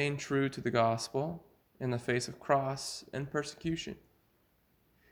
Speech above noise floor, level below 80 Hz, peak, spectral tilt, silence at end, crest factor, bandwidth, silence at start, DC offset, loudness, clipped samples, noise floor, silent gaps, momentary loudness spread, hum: 38 dB; -64 dBFS; -14 dBFS; -5 dB/octave; 1.15 s; 20 dB; over 20 kHz; 0 s; under 0.1%; -34 LUFS; under 0.1%; -71 dBFS; none; 10 LU; none